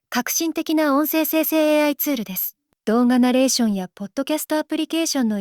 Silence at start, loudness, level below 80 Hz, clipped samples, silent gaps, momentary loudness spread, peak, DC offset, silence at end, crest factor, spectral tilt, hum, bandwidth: 0.1 s; -20 LUFS; -66 dBFS; under 0.1%; none; 9 LU; -6 dBFS; under 0.1%; 0 s; 14 dB; -3.5 dB/octave; none; over 20 kHz